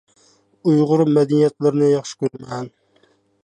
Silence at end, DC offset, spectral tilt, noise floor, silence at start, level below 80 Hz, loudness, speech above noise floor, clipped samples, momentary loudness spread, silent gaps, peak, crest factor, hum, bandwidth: 0.75 s; under 0.1%; -7.5 dB/octave; -59 dBFS; 0.65 s; -66 dBFS; -18 LUFS; 42 dB; under 0.1%; 15 LU; none; -6 dBFS; 14 dB; none; 9.6 kHz